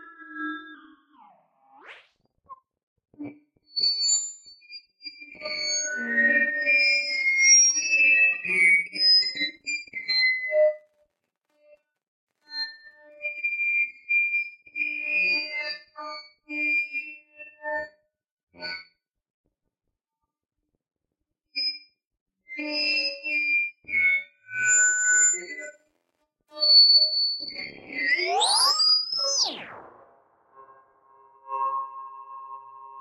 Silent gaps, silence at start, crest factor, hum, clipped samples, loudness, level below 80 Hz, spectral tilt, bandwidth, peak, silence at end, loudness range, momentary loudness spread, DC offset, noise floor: 2.83-2.96 s, 12.08-12.27 s, 18.31-18.37 s, 18.43-18.47 s, 19.30-19.44 s, 22.07-22.11 s, 22.21-22.26 s; 0 s; 18 dB; none; under 0.1%; -21 LUFS; -78 dBFS; 2 dB/octave; 13.5 kHz; -8 dBFS; 0 s; 18 LU; 23 LU; under 0.1%; -85 dBFS